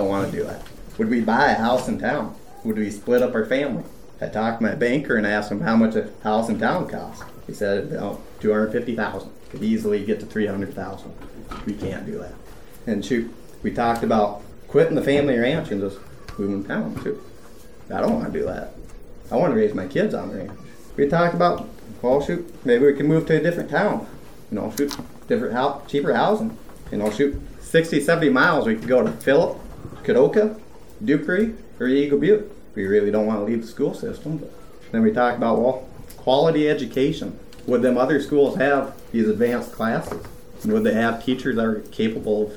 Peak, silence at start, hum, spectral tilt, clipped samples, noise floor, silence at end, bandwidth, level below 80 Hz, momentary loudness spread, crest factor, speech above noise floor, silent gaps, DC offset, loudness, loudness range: -4 dBFS; 0 s; none; -6.5 dB/octave; under 0.1%; -45 dBFS; 0 s; 18.5 kHz; -46 dBFS; 16 LU; 18 dB; 24 dB; none; 0.8%; -22 LUFS; 6 LU